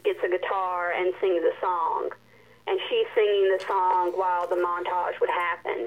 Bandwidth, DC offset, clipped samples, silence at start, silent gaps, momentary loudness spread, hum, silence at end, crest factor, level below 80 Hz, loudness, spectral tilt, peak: 11 kHz; under 0.1%; under 0.1%; 0.05 s; none; 5 LU; none; 0 s; 16 dB; -74 dBFS; -25 LUFS; -4.5 dB/octave; -10 dBFS